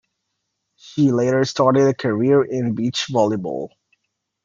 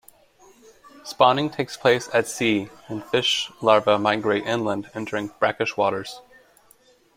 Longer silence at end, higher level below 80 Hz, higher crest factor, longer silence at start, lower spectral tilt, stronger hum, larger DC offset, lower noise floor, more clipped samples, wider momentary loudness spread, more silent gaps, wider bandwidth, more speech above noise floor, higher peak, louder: second, 0.8 s vs 0.95 s; about the same, -64 dBFS vs -64 dBFS; about the same, 18 dB vs 22 dB; second, 0.85 s vs 1.05 s; first, -6 dB/octave vs -4 dB/octave; neither; neither; first, -76 dBFS vs -57 dBFS; neither; about the same, 12 LU vs 14 LU; neither; second, 7.6 kHz vs 16.5 kHz; first, 58 dB vs 35 dB; about the same, -2 dBFS vs -2 dBFS; first, -19 LUFS vs -22 LUFS